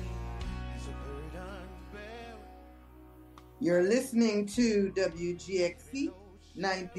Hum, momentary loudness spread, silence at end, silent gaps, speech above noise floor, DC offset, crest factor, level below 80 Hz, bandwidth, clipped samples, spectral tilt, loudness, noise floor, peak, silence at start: none; 18 LU; 0 s; none; 23 dB; under 0.1%; 18 dB; -48 dBFS; 12.5 kHz; under 0.1%; -5.5 dB/octave; -32 LUFS; -53 dBFS; -16 dBFS; 0 s